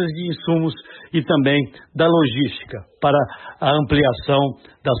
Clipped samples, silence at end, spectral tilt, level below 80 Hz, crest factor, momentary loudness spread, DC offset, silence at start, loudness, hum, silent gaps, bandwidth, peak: under 0.1%; 0 s; -11.5 dB/octave; -46 dBFS; 16 dB; 11 LU; under 0.1%; 0 s; -19 LUFS; none; none; 4.4 kHz; -4 dBFS